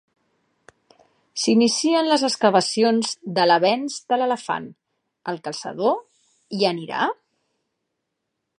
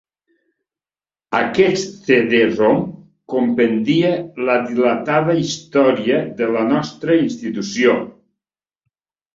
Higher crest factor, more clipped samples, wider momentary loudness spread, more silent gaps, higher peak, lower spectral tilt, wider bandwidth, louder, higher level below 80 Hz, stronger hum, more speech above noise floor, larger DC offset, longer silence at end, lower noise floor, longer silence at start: about the same, 20 dB vs 16 dB; neither; first, 13 LU vs 7 LU; neither; about the same, -4 dBFS vs -2 dBFS; second, -3.5 dB/octave vs -5.5 dB/octave; first, 11.5 kHz vs 7.8 kHz; second, -21 LUFS vs -17 LUFS; second, -76 dBFS vs -58 dBFS; neither; second, 58 dB vs over 74 dB; neither; first, 1.45 s vs 1.25 s; second, -79 dBFS vs under -90 dBFS; about the same, 1.35 s vs 1.3 s